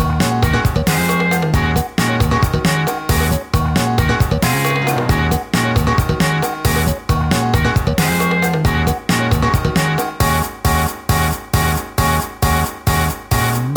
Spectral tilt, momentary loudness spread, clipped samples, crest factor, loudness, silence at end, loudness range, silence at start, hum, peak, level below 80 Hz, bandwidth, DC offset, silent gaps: -5 dB/octave; 2 LU; under 0.1%; 14 dB; -16 LUFS; 0 s; 1 LU; 0 s; none; -2 dBFS; -24 dBFS; over 20 kHz; under 0.1%; none